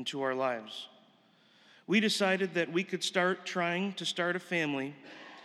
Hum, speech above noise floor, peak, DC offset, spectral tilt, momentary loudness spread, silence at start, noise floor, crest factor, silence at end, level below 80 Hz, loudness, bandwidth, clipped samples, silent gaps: none; 33 dB; -14 dBFS; under 0.1%; -4 dB/octave; 16 LU; 0 s; -65 dBFS; 18 dB; 0 s; under -90 dBFS; -31 LUFS; 14 kHz; under 0.1%; none